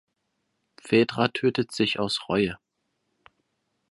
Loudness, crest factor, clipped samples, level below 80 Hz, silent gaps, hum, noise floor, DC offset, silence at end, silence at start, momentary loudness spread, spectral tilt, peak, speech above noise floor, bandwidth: -25 LUFS; 22 dB; under 0.1%; -60 dBFS; none; none; -77 dBFS; under 0.1%; 1.35 s; 0.85 s; 5 LU; -5.5 dB/octave; -6 dBFS; 52 dB; 11.5 kHz